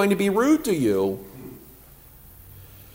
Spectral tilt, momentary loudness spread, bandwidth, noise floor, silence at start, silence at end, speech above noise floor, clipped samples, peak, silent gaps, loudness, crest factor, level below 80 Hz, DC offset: -6 dB/octave; 25 LU; 16 kHz; -48 dBFS; 0 s; 0.3 s; 27 dB; under 0.1%; -6 dBFS; none; -22 LUFS; 18 dB; -54 dBFS; under 0.1%